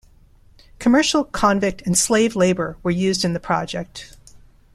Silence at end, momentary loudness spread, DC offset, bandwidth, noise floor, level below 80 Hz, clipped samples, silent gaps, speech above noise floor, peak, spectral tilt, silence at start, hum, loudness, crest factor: 0.4 s; 10 LU; under 0.1%; 15 kHz; -50 dBFS; -46 dBFS; under 0.1%; none; 31 dB; -4 dBFS; -4 dB/octave; 0.8 s; none; -19 LUFS; 18 dB